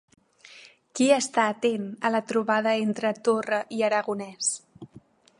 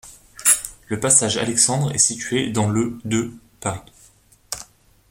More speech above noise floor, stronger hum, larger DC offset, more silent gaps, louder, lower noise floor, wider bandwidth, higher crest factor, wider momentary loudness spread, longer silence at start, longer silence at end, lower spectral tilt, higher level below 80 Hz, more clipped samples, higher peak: second, 29 dB vs 33 dB; neither; neither; neither; second, -25 LUFS vs -19 LUFS; about the same, -54 dBFS vs -53 dBFS; second, 11.5 kHz vs 16.5 kHz; about the same, 20 dB vs 22 dB; second, 6 LU vs 17 LU; first, 0.55 s vs 0.05 s; about the same, 0.55 s vs 0.45 s; about the same, -3.5 dB/octave vs -3 dB/octave; second, -76 dBFS vs -52 dBFS; neither; second, -6 dBFS vs 0 dBFS